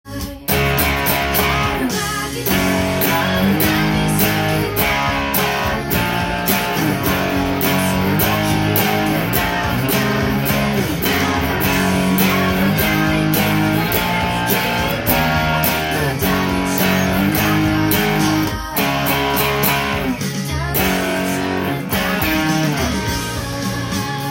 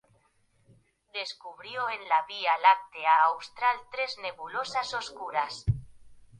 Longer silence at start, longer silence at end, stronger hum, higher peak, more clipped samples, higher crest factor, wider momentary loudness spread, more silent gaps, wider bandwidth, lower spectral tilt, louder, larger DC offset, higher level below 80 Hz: second, 0.05 s vs 1.15 s; second, 0 s vs 0.15 s; neither; first, -2 dBFS vs -8 dBFS; neither; second, 16 dB vs 22 dB; second, 4 LU vs 14 LU; neither; first, 17 kHz vs 10.5 kHz; about the same, -4.5 dB/octave vs -4 dB/octave; first, -17 LUFS vs -28 LUFS; neither; first, -34 dBFS vs -52 dBFS